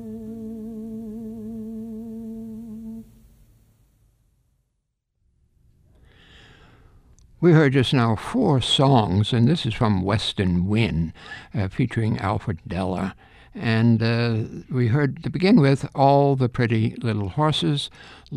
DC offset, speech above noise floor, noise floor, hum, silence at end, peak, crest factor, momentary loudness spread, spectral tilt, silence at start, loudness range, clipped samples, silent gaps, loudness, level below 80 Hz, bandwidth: under 0.1%; 55 dB; -75 dBFS; none; 0 s; -4 dBFS; 20 dB; 18 LU; -7 dB/octave; 0 s; 17 LU; under 0.1%; none; -21 LUFS; -48 dBFS; 11.5 kHz